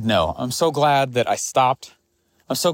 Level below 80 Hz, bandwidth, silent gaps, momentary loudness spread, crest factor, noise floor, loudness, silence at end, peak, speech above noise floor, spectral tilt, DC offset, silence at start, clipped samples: -50 dBFS; 16.5 kHz; none; 6 LU; 16 dB; -65 dBFS; -20 LUFS; 0 s; -6 dBFS; 45 dB; -4 dB/octave; under 0.1%; 0 s; under 0.1%